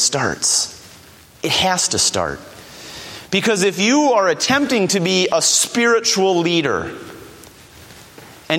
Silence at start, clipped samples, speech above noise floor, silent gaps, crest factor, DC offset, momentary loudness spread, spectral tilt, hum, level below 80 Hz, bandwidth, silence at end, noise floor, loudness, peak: 0 s; under 0.1%; 27 dB; none; 18 dB; under 0.1%; 18 LU; -2.5 dB/octave; none; -52 dBFS; 17 kHz; 0 s; -44 dBFS; -16 LUFS; 0 dBFS